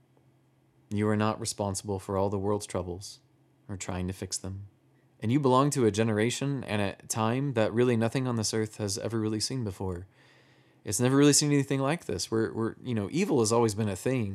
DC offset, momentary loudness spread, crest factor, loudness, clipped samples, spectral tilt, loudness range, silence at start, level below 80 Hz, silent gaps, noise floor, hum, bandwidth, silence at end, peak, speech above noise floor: under 0.1%; 13 LU; 20 dB; -28 LUFS; under 0.1%; -5 dB/octave; 7 LU; 0.9 s; -70 dBFS; none; -65 dBFS; none; 14.5 kHz; 0 s; -10 dBFS; 37 dB